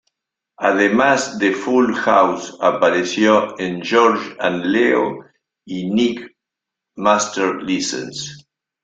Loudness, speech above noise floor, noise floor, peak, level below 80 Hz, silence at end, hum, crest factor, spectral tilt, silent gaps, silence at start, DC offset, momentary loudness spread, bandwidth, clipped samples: -17 LUFS; 66 dB; -83 dBFS; 0 dBFS; -60 dBFS; 0.45 s; none; 18 dB; -4 dB/octave; none; 0.6 s; under 0.1%; 11 LU; 9.4 kHz; under 0.1%